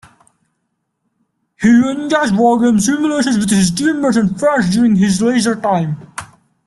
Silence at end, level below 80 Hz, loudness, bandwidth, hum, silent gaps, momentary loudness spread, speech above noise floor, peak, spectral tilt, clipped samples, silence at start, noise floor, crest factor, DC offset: 0.4 s; -48 dBFS; -14 LUFS; 12.5 kHz; none; none; 6 LU; 57 dB; -2 dBFS; -5 dB/octave; under 0.1%; 1.6 s; -70 dBFS; 14 dB; under 0.1%